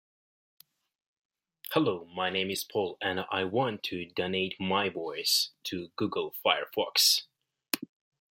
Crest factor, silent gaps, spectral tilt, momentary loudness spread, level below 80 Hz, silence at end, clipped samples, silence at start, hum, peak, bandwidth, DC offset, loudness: 24 dB; none; -2.5 dB/octave; 11 LU; -76 dBFS; 0.45 s; under 0.1%; 1.7 s; none; -8 dBFS; 16.5 kHz; under 0.1%; -29 LUFS